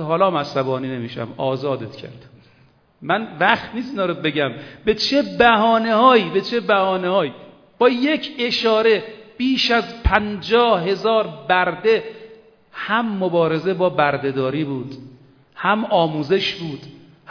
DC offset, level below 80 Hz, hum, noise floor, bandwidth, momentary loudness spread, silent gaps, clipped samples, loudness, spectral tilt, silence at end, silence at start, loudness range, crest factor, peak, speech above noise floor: under 0.1%; -38 dBFS; none; -55 dBFS; 5.4 kHz; 12 LU; none; under 0.1%; -19 LUFS; -6 dB/octave; 0.35 s; 0 s; 6 LU; 20 dB; 0 dBFS; 36 dB